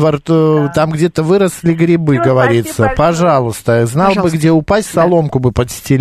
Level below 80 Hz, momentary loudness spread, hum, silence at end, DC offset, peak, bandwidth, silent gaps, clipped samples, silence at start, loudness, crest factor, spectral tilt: -36 dBFS; 4 LU; none; 0 s; under 0.1%; 0 dBFS; 14 kHz; none; under 0.1%; 0 s; -12 LUFS; 12 dB; -6.5 dB/octave